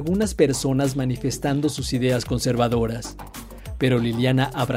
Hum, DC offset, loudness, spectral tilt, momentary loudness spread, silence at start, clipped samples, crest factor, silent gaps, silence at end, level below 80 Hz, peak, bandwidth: none; under 0.1%; -22 LUFS; -5.5 dB/octave; 14 LU; 0 s; under 0.1%; 18 dB; none; 0 s; -40 dBFS; -4 dBFS; 16 kHz